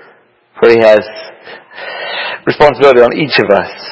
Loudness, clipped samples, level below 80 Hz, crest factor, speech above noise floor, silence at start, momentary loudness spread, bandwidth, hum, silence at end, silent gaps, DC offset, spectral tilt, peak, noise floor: -9 LUFS; 2%; -44 dBFS; 10 dB; 37 dB; 0.55 s; 20 LU; 8 kHz; none; 0 s; none; under 0.1%; -6 dB/octave; 0 dBFS; -46 dBFS